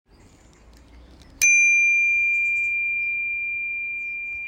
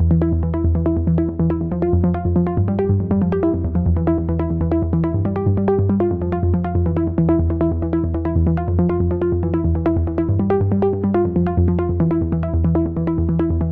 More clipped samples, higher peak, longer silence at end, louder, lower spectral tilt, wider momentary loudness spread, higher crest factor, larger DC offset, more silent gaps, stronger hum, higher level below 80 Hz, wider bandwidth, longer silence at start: neither; about the same, -4 dBFS vs -6 dBFS; about the same, 0 s vs 0 s; about the same, -19 LUFS vs -19 LUFS; second, 1.5 dB/octave vs -13 dB/octave; first, 12 LU vs 2 LU; first, 20 dB vs 12 dB; neither; neither; neither; second, -54 dBFS vs -28 dBFS; first, 16 kHz vs 3.3 kHz; first, 0.95 s vs 0 s